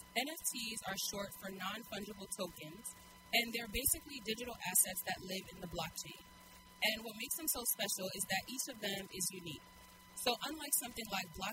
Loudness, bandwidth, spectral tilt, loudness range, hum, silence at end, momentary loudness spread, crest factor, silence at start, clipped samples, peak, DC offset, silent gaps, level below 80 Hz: -38 LUFS; 16 kHz; -1.5 dB/octave; 3 LU; none; 0 s; 15 LU; 24 dB; 0 s; under 0.1%; -18 dBFS; under 0.1%; none; -62 dBFS